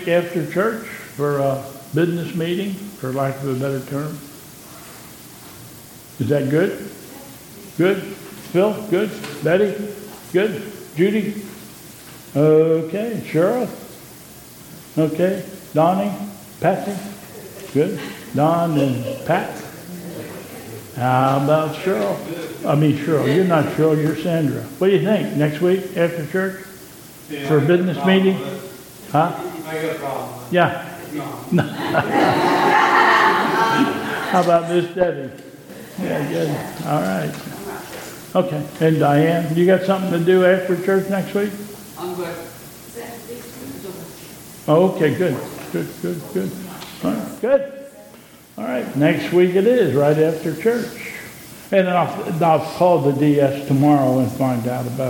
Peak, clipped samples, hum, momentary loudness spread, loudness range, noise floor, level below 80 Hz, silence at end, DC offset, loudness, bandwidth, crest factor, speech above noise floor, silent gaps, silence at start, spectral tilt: 0 dBFS; under 0.1%; none; 20 LU; 7 LU; -44 dBFS; -58 dBFS; 0 s; under 0.1%; -19 LUFS; 17.5 kHz; 20 dB; 26 dB; none; 0 s; -6.5 dB/octave